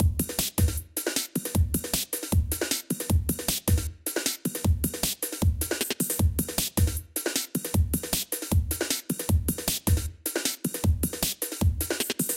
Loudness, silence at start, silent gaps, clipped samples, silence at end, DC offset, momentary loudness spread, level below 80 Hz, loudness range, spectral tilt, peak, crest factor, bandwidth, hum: -27 LUFS; 0 s; none; under 0.1%; 0 s; under 0.1%; 3 LU; -34 dBFS; 0 LU; -4 dB/octave; -8 dBFS; 20 dB; 17 kHz; none